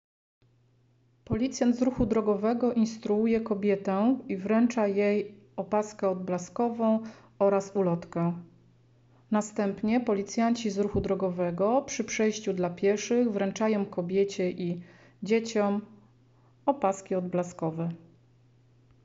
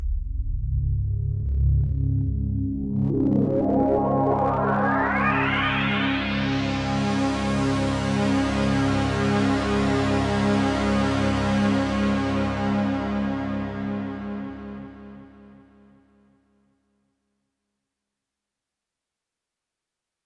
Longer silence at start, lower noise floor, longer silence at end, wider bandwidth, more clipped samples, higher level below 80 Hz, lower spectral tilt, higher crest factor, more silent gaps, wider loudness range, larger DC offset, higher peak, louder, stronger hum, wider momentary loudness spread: first, 1.3 s vs 0 s; second, -65 dBFS vs -86 dBFS; second, 1.1 s vs 4.75 s; second, 8 kHz vs 11 kHz; neither; second, -56 dBFS vs -34 dBFS; about the same, -6.5 dB/octave vs -6.5 dB/octave; about the same, 16 dB vs 14 dB; neither; second, 4 LU vs 9 LU; neither; about the same, -12 dBFS vs -10 dBFS; second, -28 LUFS vs -23 LUFS; neither; about the same, 7 LU vs 8 LU